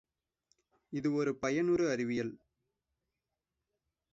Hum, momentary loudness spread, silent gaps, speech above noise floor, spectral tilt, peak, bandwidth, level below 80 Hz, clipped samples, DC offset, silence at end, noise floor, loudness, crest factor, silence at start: none; 9 LU; none; 56 dB; -6 dB/octave; -20 dBFS; 7.8 kHz; -70 dBFS; under 0.1%; under 0.1%; 1.75 s; -89 dBFS; -34 LUFS; 18 dB; 0.9 s